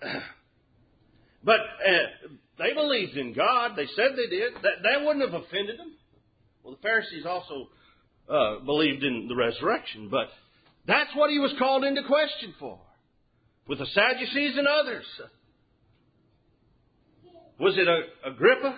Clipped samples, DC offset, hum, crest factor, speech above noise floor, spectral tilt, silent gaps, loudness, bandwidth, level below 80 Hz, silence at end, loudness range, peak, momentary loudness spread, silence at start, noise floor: under 0.1%; under 0.1%; none; 20 dB; 41 dB; -8.5 dB/octave; none; -26 LUFS; 5 kHz; -66 dBFS; 0 s; 5 LU; -8 dBFS; 14 LU; 0 s; -67 dBFS